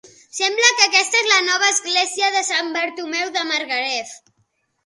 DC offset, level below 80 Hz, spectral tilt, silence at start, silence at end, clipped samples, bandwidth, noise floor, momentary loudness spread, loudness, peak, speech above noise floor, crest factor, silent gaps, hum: under 0.1%; -76 dBFS; 2 dB/octave; 0.05 s; 0.7 s; under 0.1%; 11.5 kHz; -67 dBFS; 10 LU; -17 LUFS; 0 dBFS; 48 dB; 20 dB; none; none